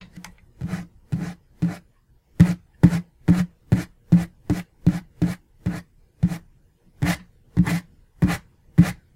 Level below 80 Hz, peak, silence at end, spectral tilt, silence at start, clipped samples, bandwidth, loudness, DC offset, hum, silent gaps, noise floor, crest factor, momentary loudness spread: -40 dBFS; 0 dBFS; 0.2 s; -7.5 dB/octave; 0 s; under 0.1%; 15 kHz; -24 LUFS; under 0.1%; none; none; -59 dBFS; 22 dB; 13 LU